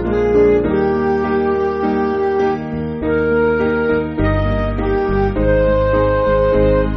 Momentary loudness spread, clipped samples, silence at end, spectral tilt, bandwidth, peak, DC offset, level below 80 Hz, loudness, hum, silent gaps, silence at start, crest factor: 5 LU; under 0.1%; 0 s; -7 dB/octave; 6.2 kHz; -4 dBFS; under 0.1%; -26 dBFS; -16 LUFS; none; none; 0 s; 12 dB